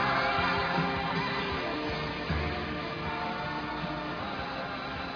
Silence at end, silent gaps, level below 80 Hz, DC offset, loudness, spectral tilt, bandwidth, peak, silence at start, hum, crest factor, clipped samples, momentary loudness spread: 0 s; none; -46 dBFS; under 0.1%; -31 LUFS; -6 dB/octave; 5.4 kHz; -16 dBFS; 0 s; none; 16 dB; under 0.1%; 8 LU